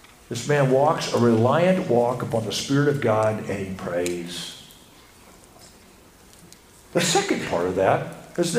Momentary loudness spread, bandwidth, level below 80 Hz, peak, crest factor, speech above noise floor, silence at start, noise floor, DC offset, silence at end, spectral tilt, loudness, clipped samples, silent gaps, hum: 13 LU; 15.5 kHz; -56 dBFS; -4 dBFS; 18 dB; 29 dB; 0.3 s; -50 dBFS; under 0.1%; 0 s; -5 dB/octave; -22 LUFS; under 0.1%; none; none